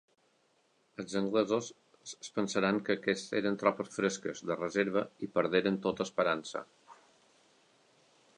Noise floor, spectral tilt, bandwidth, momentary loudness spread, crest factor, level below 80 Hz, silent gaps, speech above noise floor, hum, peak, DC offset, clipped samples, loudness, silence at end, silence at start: -72 dBFS; -4.5 dB/octave; 11 kHz; 15 LU; 22 dB; -74 dBFS; none; 40 dB; none; -12 dBFS; under 0.1%; under 0.1%; -33 LUFS; 1.45 s; 1 s